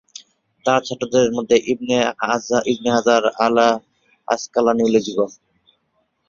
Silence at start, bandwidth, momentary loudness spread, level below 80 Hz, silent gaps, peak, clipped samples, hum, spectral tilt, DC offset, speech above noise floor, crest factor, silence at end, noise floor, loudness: 0.65 s; 7.4 kHz; 8 LU; -58 dBFS; none; -2 dBFS; under 0.1%; none; -4 dB/octave; under 0.1%; 50 dB; 18 dB; 1 s; -68 dBFS; -18 LUFS